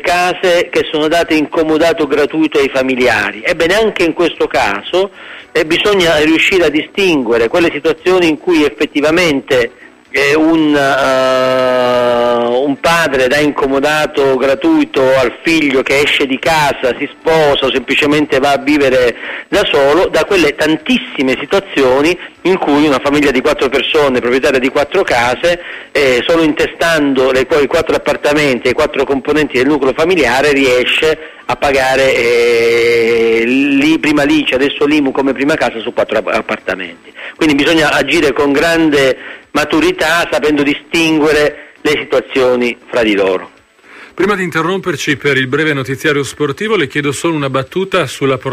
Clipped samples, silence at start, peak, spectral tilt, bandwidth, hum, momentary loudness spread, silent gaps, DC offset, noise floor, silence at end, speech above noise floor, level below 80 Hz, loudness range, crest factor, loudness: under 0.1%; 0 s; 0 dBFS; -4.5 dB/octave; 15.5 kHz; none; 5 LU; none; under 0.1%; -39 dBFS; 0 s; 28 dB; -40 dBFS; 3 LU; 12 dB; -12 LUFS